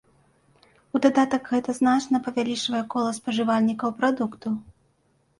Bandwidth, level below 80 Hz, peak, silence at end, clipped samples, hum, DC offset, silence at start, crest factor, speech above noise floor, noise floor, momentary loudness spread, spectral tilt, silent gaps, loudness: 11.5 kHz; -66 dBFS; -6 dBFS; 0.8 s; under 0.1%; none; under 0.1%; 0.95 s; 18 dB; 43 dB; -66 dBFS; 7 LU; -4.5 dB/octave; none; -24 LUFS